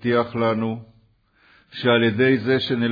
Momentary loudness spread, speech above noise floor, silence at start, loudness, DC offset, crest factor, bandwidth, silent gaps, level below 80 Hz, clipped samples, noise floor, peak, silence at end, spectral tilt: 11 LU; 39 dB; 0 s; -20 LUFS; under 0.1%; 16 dB; 5 kHz; none; -60 dBFS; under 0.1%; -59 dBFS; -6 dBFS; 0 s; -8 dB/octave